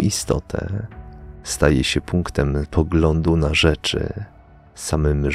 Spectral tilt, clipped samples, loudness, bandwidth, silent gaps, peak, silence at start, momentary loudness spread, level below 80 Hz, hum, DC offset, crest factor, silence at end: -5 dB/octave; under 0.1%; -20 LUFS; 15.5 kHz; none; -2 dBFS; 0 s; 17 LU; -28 dBFS; none; under 0.1%; 18 dB; 0 s